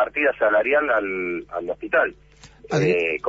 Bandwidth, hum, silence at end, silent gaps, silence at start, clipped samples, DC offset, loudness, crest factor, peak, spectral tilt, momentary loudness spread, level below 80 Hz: 7.8 kHz; none; 0 s; none; 0 s; under 0.1%; under 0.1%; -22 LUFS; 14 dB; -8 dBFS; -6 dB/octave; 9 LU; -54 dBFS